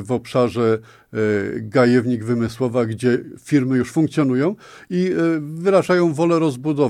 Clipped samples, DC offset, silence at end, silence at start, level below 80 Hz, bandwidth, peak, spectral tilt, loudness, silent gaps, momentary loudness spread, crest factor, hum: under 0.1%; under 0.1%; 0 s; 0 s; -58 dBFS; 13.5 kHz; -2 dBFS; -7 dB/octave; -19 LUFS; none; 7 LU; 16 dB; none